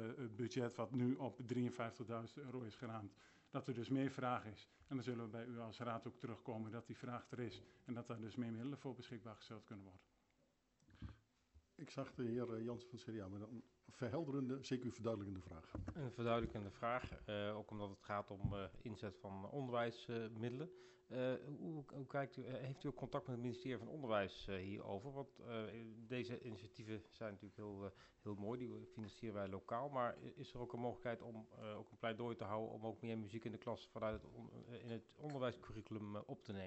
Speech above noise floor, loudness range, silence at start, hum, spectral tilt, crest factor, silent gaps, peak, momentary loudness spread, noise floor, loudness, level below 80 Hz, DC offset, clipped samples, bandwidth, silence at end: 33 dB; 5 LU; 0 s; none; -7 dB/octave; 20 dB; none; -28 dBFS; 11 LU; -81 dBFS; -48 LUFS; -70 dBFS; under 0.1%; under 0.1%; 8.2 kHz; 0 s